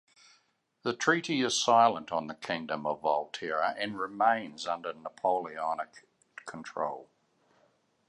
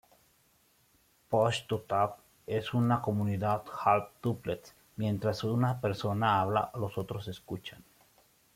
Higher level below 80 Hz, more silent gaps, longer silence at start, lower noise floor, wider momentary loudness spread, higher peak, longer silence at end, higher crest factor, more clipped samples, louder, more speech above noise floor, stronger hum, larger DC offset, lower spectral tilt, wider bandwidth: second, -76 dBFS vs -66 dBFS; neither; second, 0.85 s vs 1.3 s; about the same, -71 dBFS vs -68 dBFS; first, 16 LU vs 12 LU; about the same, -10 dBFS vs -12 dBFS; first, 1.05 s vs 0.75 s; about the same, 22 dB vs 20 dB; neither; about the same, -30 LUFS vs -32 LUFS; first, 41 dB vs 37 dB; neither; neither; second, -3 dB/octave vs -7 dB/octave; second, 11.5 kHz vs 16 kHz